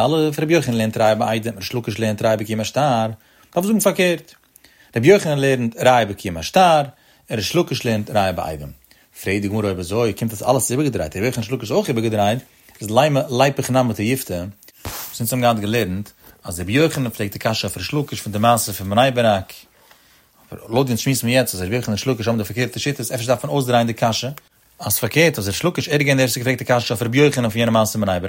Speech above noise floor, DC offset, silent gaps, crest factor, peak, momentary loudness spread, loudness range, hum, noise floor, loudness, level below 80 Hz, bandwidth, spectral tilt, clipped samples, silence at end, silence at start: 35 dB; under 0.1%; none; 18 dB; 0 dBFS; 11 LU; 4 LU; none; -53 dBFS; -19 LUFS; -50 dBFS; 16.5 kHz; -5 dB/octave; under 0.1%; 0 s; 0 s